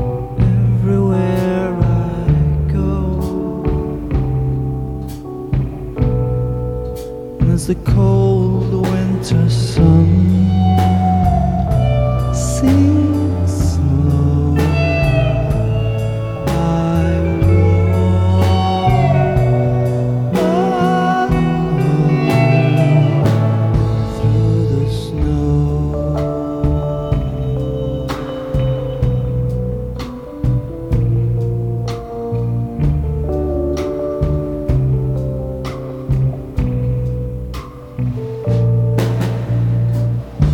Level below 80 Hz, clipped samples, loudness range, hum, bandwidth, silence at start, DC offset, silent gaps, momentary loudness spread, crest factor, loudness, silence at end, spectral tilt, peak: -26 dBFS; under 0.1%; 6 LU; none; 13.5 kHz; 0 s; 0.2%; none; 9 LU; 14 dB; -16 LUFS; 0 s; -8 dB/octave; -2 dBFS